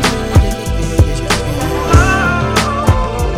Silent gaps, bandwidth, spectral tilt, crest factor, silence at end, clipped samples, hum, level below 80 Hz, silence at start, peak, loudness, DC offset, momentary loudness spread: none; 16 kHz; -5 dB/octave; 12 dB; 0 s; under 0.1%; none; -18 dBFS; 0 s; 0 dBFS; -13 LUFS; under 0.1%; 6 LU